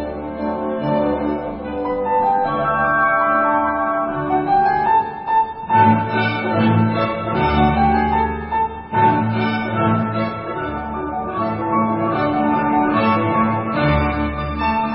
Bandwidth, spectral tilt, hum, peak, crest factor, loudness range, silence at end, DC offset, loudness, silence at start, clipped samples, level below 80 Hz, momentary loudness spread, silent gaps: 5.6 kHz; -12 dB/octave; none; -2 dBFS; 16 dB; 3 LU; 0 s; under 0.1%; -18 LUFS; 0 s; under 0.1%; -36 dBFS; 8 LU; none